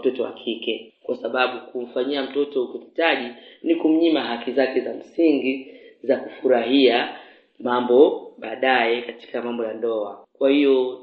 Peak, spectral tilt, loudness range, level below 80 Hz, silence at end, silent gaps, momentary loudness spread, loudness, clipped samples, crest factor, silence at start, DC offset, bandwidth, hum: -2 dBFS; -7 dB/octave; 4 LU; -78 dBFS; 0 s; none; 14 LU; -22 LUFS; under 0.1%; 20 dB; 0 s; under 0.1%; 5 kHz; none